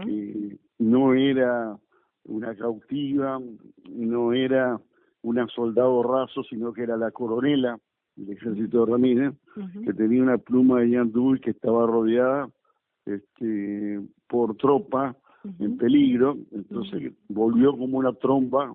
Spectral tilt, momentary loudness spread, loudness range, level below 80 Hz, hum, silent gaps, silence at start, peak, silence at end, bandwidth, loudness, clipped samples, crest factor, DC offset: -11 dB/octave; 15 LU; 5 LU; -66 dBFS; none; none; 0 s; -8 dBFS; 0 s; 3.9 kHz; -24 LUFS; under 0.1%; 16 dB; under 0.1%